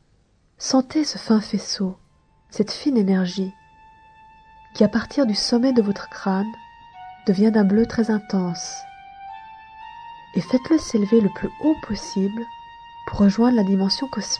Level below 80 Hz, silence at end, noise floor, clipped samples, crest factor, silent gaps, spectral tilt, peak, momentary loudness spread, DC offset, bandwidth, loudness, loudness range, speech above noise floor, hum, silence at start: -50 dBFS; 0 s; -60 dBFS; under 0.1%; 18 dB; none; -5.5 dB/octave; -4 dBFS; 21 LU; under 0.1%; 9.8 kHz; -21 LUFS; 3 LU; 40 dB; none; 0.6 s